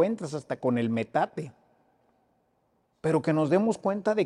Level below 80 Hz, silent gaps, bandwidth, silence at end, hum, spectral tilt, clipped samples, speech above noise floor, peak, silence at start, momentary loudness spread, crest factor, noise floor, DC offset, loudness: -70 dBFS; none; 11 kHz; 0 s; none; -7 dB/octave; under 0.1%; 45 dB; -12 dBFS; 0 s; 10 LU; 16 dB; -71 dBFS; under 0.1%; -28 LUFS